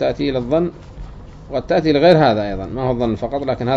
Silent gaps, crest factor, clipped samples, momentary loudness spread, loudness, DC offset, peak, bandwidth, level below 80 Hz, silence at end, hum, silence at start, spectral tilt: none; 18 dB; under 0.1%; 23 LU; -17 LUFS; under 0.1%; 0 dBFS; 7.6 kHz; -38 dBFS; 0 s; none; 0 s; -7.5 dB/octave